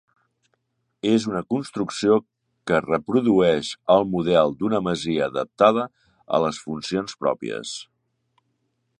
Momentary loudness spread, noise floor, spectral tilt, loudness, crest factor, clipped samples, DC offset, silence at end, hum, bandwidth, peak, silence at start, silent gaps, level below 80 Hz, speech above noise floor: 10 LU; -73 dBFS; -5.5 dB/octave; -22 LUFS; 20 dB; under 0.1%; under 0.1%; 1.15 s; none; 11 kHz; -2 dBFS; 1.05 s; none; -58 dBFS; 51 dB